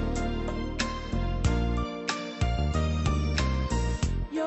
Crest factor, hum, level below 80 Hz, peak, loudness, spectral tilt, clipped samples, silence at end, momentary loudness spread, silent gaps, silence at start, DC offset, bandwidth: 14 dB; none; -32 dBFS; -14 dBFS; -29 LUFS; -5.5 dB/octave; under 0.1%; 0 s; 5 LU; none; 0 s; under 0.1%; 8.4 kHz